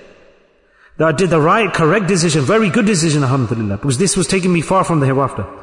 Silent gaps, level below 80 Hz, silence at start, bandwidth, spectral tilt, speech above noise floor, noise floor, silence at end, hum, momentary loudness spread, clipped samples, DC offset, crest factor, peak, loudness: none; -44 dBFS; 1 s; 11 kHz; -5 dB/octave; 38 dB; -52 dBFS; 0 s; none; 5 LU; under 0.1%; under 0.1%; 12 dB; -4 dBFS; -14 LUFS